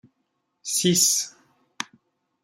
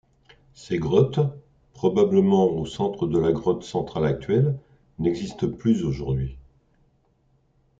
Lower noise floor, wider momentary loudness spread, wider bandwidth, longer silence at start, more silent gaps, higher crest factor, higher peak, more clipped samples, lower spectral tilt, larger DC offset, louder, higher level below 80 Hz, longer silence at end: first, -75 dBFS vs -64 dBFS; first, 18 LU vs 9 LU; first, 16 kHz vs 7.8 kHz; about the same, 0.65 s vs 0.6 s; neither; about the same, 22 dB vs 18 dB; about the same, -6 dBFS vs -6 dBFS; neither; second, -2.5 dB/octave vs -8 dB/octave; neither; first, -20 LUFS vs -24 LUFS; second, -70 dBFS vs -48 dBFS; second, 0.6 s vs 1.4 s